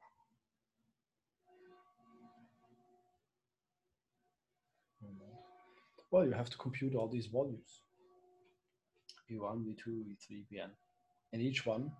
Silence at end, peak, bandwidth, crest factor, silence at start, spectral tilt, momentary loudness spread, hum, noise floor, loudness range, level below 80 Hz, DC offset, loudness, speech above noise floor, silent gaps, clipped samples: 0.05 s; -20 dBFS; 10.5 kHz; 24 dB; 0.05 s; -6.5 dB/octave; 25 LU; none; under -90 dBFS; 9 LU; -78 dBFS; under 0.1%; -39 LUFS; over 51 dB; none; under 0.1%